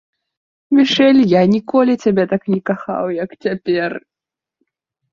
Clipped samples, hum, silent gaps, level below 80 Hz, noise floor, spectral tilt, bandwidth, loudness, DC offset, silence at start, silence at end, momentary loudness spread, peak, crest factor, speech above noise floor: under 0.1%; none; none; -58 dBFS; -87 dBFS; -6.5 dB/octave; 7.2 kHz; -15 LUFS; under 0.1%; 0.7 s; 1.15 s; 11 LU; -2 dBFS; 14 dB; 72 dB